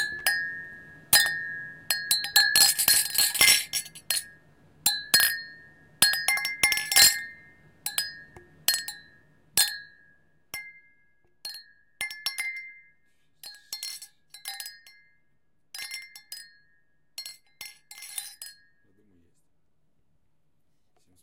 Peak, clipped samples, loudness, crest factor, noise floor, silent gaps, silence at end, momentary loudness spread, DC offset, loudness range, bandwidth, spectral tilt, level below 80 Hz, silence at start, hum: -2 dBFS; under 0.1%; -23 LUFS; 28 dB; -76 dBFS; none; 2.7 s; 25 LU; under 0.1%; 21 LU; 17 kHz; 2 dB/octave; -66 dBFS; 0 s; none